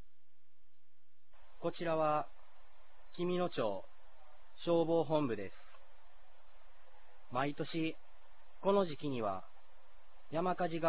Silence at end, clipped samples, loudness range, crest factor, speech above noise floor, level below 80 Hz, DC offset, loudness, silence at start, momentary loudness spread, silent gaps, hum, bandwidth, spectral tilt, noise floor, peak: 0 s; under 0.1%; 4 LU; 20 dB; 48 dB; -72 dBFS; 0.8%; -37 LUFS; 1.6 s; 12 LU; none; none; 4 kHz; -5.5 dB/octave; -83 dBFS; -18 dBFS